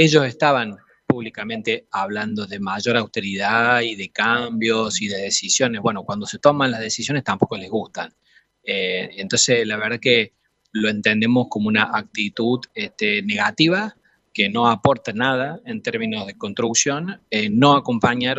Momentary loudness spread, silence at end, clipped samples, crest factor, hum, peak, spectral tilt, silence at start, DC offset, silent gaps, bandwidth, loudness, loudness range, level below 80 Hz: 11 LU; 0 s; under 0.1%; 20 dB; none; 0 dBFS; -3.5 dB/octave; 0 s; under 0.1%; none; 8.4 kHz; -20 LUFS; 3 LU; -60 dBFS